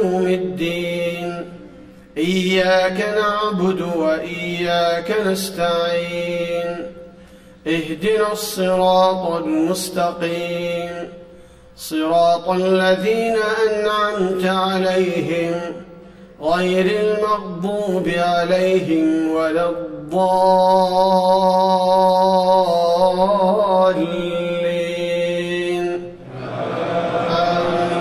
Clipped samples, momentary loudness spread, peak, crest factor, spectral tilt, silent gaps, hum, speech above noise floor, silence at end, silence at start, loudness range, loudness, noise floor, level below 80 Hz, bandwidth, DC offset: under 0.1%; 10 LU; -4 dBFS; 14 dB; -5.5 dB/octave; none; none; 26 dB; 0 s; 0 s; 6 LU; -18 LUFS; -43 dBFS; -52 dBFS; 15.5 kHz; under 0.1%